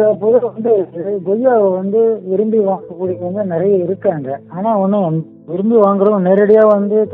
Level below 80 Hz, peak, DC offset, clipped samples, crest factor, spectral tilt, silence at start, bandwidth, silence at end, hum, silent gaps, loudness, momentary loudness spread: -62 dBFS; 0 dBFS; under 0.1%; under 0.1%; 14 dB; -11.5 dB/octave; 0 s; 3.7 kHz; 0 s; none; none; -14 LUFS; 11 LU